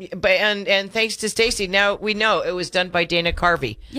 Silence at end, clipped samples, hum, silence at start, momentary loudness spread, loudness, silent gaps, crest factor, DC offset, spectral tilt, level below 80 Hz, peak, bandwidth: 0 s; under 0.1%; none; 0 s; 4 LU; -19 LUFS; none; 16 dB; under 0.1%; -3 dB/octave; -40 dBFS; -4 dBFS; 15.5 kHz